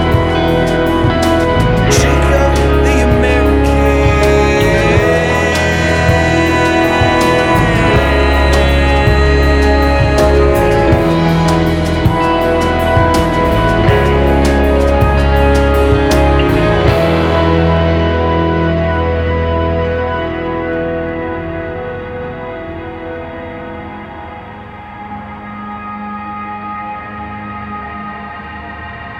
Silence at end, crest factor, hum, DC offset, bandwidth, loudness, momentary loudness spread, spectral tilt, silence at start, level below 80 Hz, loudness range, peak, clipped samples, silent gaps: 0 s; 12 dB; none; under 0.1%; 16.5 kHz; -12 LUFS; 15 LU; -6 dB/octave; 0 s; -18 dBFS; 14 LU; 0 dBFS; under 0.1%; none